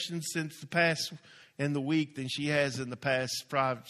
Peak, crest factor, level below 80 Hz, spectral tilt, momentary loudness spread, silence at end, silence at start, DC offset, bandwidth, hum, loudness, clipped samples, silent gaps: -12 dBFS; 20 dB; -70 dBFS; -4.5 dB/octave; 8 LU; 0 s; 0 s; under 0.1%; 14.5 kHz; none; -31 LUFS; under 0.1%; none